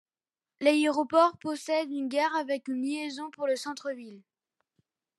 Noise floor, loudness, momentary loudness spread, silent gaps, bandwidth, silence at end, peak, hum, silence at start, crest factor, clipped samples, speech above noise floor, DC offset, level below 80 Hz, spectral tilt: under -90 dBFS; -29 LUFS; 12 LU; none; 12.5 kHz; 1 s; -10 dBFS; none; 0.6 s; 20 dB; under 0.1%; over 62 dB; under 0.1%; -86 dBFS; -3 dB/octave